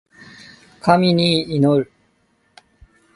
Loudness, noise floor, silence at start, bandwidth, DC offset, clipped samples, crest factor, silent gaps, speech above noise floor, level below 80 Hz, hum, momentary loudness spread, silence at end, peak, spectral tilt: -17 LUFS; -62 dBFS; 0.85 s; 11.5 kHz; under 0.1%; under 0.1%; 20 dB; none; 47 dB; -56 dBFS; none; 8 LU; 1.3 s; 0 dBFS; -6.5 dB/octave